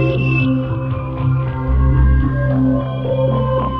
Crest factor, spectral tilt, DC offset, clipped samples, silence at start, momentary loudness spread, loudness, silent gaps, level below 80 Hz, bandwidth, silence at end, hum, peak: 12 dB; -10.5 dB/octave; under 0.1%; under 0.1%; 0 s; 6 LU; -17 LUFS; none; -20 dBFS; 4.1 kHz; 0 s; none; -4 dBFS